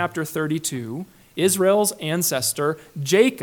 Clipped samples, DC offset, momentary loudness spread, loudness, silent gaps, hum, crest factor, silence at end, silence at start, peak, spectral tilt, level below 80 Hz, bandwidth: under 0.1%; under 0.1%; 13 LU; -21 LUFS; none; none; 18 dB; 0 s; 0 s; -4 dBFS; -4 dB/octave; -64 dBFS; 19 kHz